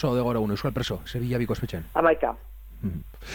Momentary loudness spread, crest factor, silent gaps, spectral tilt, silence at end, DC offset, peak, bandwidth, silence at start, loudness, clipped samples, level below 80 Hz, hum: 13 LU; 20 dB; none; -7 dB/octave; 0 s; under 0.1%; -6 dBFS; 17.5 kHz; 0 s; -27 LUFS; under 0.1%; -42 dBFS; none